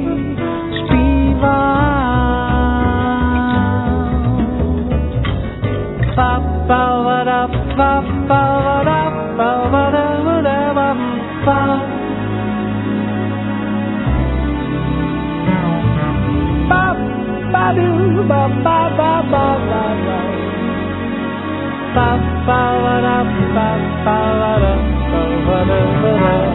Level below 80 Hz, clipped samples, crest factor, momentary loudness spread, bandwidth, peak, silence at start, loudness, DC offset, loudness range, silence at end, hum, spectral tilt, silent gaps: -24 dBFS; under 0.1%; 14 dB; 6 LU; 4.1 kHz; 0 dBFS; 0 s; -16 LUFS; under 0.1%; 3 LU; 0 s; none; -11.5 dB/octave; none